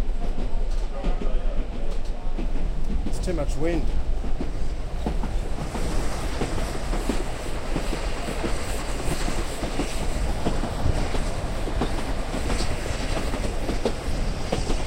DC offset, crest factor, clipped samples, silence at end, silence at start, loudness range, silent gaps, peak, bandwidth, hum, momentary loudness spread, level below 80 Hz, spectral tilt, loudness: under 0.1%; 16 dB; under 0.1%; 0 s; 0 s; 2 LU; none; -8 dBFS; 12.5 kHz; none; 4 LU; -26 dBFS; -5 dB/octave; -29 LUFS